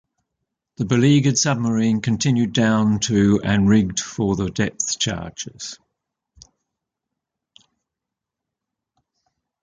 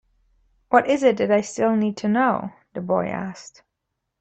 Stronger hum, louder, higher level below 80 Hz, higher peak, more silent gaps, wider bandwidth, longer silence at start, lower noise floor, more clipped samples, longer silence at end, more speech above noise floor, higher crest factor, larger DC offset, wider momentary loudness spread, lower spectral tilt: neither; about the same, -19 LUFS vs -21 LUFS; first, -48 dBFS vs -62 dBFS; about the same, -4 dBFS vs -2 dBFS; neither; about the same, 9.4 kHz vs 8.8 kHz; about the same, 0.8 s vs 0.7 s; first, -85 dBFS vs -79 dBFS; neither; first, 3.9 s vs 0.7 s; first, 66 dB vs 59 dB; about the same, 18 dB vs 20 dB; neither; about the same, 13 LU vs 15 LU; about the same, -5 dB/octave vs -6 dB/octave